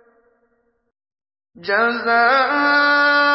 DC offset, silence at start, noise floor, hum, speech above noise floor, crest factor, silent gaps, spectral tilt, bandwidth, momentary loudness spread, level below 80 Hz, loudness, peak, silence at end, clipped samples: under 0.1%; 1.6 s; -65 dBFS; none; 49 dB; 16 dB; none; -6.5 dB/octave; 5.8 kHz; 6 LU; -72 dBFS; -15 LUFS; -4 dBFS; 0 s; under 0.1%